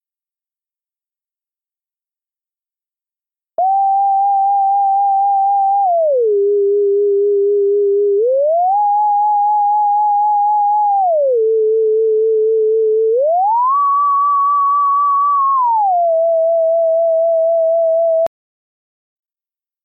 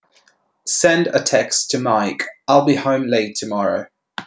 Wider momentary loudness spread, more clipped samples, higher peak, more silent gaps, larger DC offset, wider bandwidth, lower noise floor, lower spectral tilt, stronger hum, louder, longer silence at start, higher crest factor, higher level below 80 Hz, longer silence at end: second, 1 LU vs 9 LU; neither; second, -10 dBFS vs -2 dBFS; neither; neither; second, 1.3 kHz vs 8 kHz; first, under -90 dBFS vs -58 dBFS; first, -8.5 dB/octave vs -3.5 dB/octave; neither; first, -14 LUFS vs -17 LUFS; first, 3.6 s vs 0.65 s; second, 4 dB vs 18 dB; second, -76 dBFS vs -64 dBFS; first, 1.55 s vs 0 s